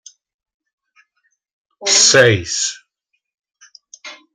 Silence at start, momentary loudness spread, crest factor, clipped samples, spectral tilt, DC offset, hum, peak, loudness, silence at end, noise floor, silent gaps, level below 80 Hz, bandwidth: 1.8 s; 27 LU; 20 dB; under 0.1%; -1.5 dB/octave; under 0.1%; none; 0 dBFS; -12 LUFS; 0.2 s; -73 dBFS; none; -58 dBFS; 13.5 kHz